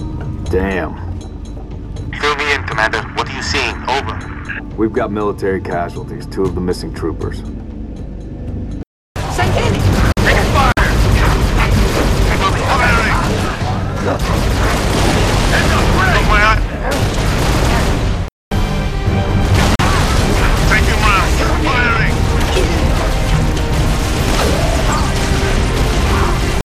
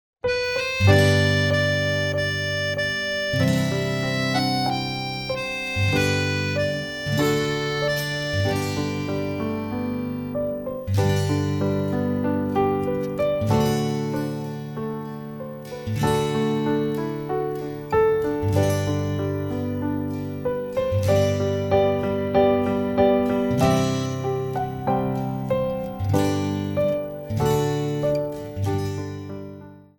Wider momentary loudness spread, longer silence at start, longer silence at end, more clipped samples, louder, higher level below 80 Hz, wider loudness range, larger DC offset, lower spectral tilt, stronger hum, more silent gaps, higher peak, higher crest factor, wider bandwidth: first, 13 LU vs 8 LU; second, 0 s vs 0.25 s; about the same, 0.05 s vs 0.15 s; neither; first, -15 LUFS vs -23 LUFS; first, -18 dBFS vs -46 dBFS; about the same, 6 LU vs 5 LU; neither; about the same, -5 dB/octave vs -6 dB/octave; neither; first, 8.87-9.15 s, 18.32-18.51 s vs none; about the same, 0 dBFS vs -2 dBFS; second, 14 dB vs 20 dB; second, 15 kHz vs 17 kHz